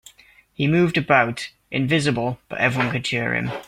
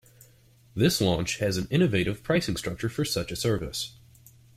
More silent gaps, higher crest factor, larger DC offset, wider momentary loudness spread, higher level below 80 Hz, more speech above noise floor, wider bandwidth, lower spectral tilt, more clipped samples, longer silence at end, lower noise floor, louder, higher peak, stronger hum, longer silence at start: neither; about the same, 20 dB vs 18 dB; neither; about the same, 8 LU vs 9 LU; about the same, -54 dBFS vs -50 dBFS; about the same, 31 dB vs 31 dB; about the same, 15.5 kHz vs 16 kHz; about the same, -5.5 dB/octave vs -5 dB/octave; neither; second, 0 s vs 0.65 s; second, -52 dBFS vs -57 dBFS; first, -21 LUFS vs -27 LUFS; first, 0 dBFS vs -10 dBFS; neither; second, 0.6 s vs 0.75 s